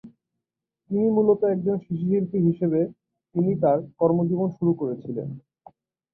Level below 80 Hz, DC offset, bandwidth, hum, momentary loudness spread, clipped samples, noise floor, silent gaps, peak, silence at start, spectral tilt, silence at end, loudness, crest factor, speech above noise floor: -64 dBFS; under 0.1%; 2.6 kHz; none; 11 LU; under 0.1%; -85 dBFS; none; -8 dBFS; 0.05 s; -13.5 dB/octave; 0.75 s; -24 LUFS; 16 dB; 63 dB